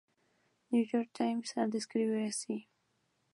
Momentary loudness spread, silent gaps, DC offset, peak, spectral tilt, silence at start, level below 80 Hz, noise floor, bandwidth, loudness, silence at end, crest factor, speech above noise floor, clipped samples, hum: 6 LU; none; under 0.1%; -20 dBFS; -4.5 dB/octave; 0.7 s; -88 dBFS; -78 dBFS; 11.5 kHz; -35 LUFS; 0.7 s; 16 dB; 44 dB; under 0.1%; none